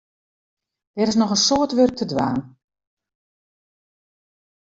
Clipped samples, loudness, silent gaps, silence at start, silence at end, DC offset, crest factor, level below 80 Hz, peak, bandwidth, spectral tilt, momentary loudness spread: under 0.1%; -19 LUFS; none; 0.95 s; 2.2 s; under 0.1%; 20 dB; -58 dBFS; -4 dBFS; 7.8 kHz; -4 dB/octave; 9 LU